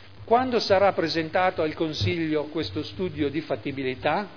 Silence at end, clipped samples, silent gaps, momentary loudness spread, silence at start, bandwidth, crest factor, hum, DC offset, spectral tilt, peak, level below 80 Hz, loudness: 0 s; under 0.1%; none; 9 LU; 0 s; 5.4 kHz; 18 dB; none; 0.4%; -6 dB/octave; -8 dBFS; -54 dBFS; -25 LUFS